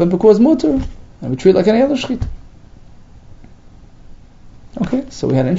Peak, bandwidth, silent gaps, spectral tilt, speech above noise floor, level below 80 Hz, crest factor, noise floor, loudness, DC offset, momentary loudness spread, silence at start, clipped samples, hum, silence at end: 0 dBFS; 7.8 kHz; none; -7.5 dB/octave; 27 dB; -34 dBFS; 16 dB; -40 dBFS; -15 LUFS; under 0.1%; 18 LU; 0 s; under 0.1%; 60 Hz at -45 dBFS; 0 s